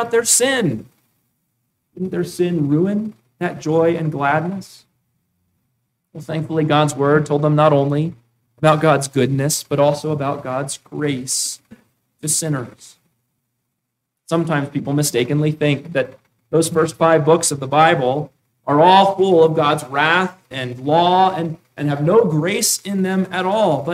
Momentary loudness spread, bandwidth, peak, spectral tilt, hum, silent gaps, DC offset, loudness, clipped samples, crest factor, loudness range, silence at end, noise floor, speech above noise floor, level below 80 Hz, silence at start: 12 LU; 16 kHz; 0 dBFS; -4.5 dB/octave; none; none; under 0.1%; -17 LUFS; under 0.1%; 18 dB; 8 LU; 0 s; -76 dBFS; 60 dB; -60 dBFS; 0 s